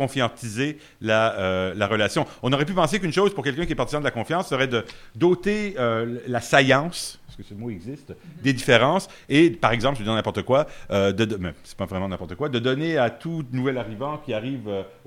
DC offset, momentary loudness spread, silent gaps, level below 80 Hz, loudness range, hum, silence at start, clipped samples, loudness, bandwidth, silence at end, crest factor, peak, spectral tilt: under 0.1%; 13 LU; none; -46 dBFS; 4 LU; none; 0 s; under 0.1%; -23 LUFS; 16 kHz; 0.15 s; 22 dB; 0 dBFS; -5.5 dB/octave